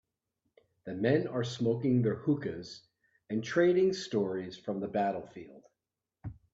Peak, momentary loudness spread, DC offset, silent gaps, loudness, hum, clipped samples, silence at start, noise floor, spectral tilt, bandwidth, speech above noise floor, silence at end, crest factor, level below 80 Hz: -14 dBFS; 20 LU; under 0.1%; none; -31 LUFS; none; under 0.1%; 0.85 s; -89 dBFS; -7 dB/octave; 7.8 kHz; 59 dB; 0.2 s; 20 dB; -68 dBFS